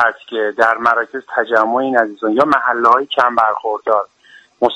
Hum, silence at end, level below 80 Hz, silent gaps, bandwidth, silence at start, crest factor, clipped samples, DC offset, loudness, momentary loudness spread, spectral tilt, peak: none; 0 s; -60 dBFS; none; 10.5 kHz; 0 s; 16 dB; under 0.1%; under 0.1%; -15 LUFS; 7 LU; -5 dB/octave; 0 dBFS